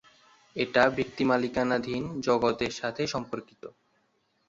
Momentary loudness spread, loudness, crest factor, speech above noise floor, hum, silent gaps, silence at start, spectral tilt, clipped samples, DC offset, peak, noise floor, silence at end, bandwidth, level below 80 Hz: 16 LU; -28 LUFS; 22 dB; 44 dB; none; none; 0.55 s; -5 dB/octave; under 0.1%; under 0.1%; -8 dBFS; -72 dBFS; 0.8 s; 7.8 kHz; -60 dBFS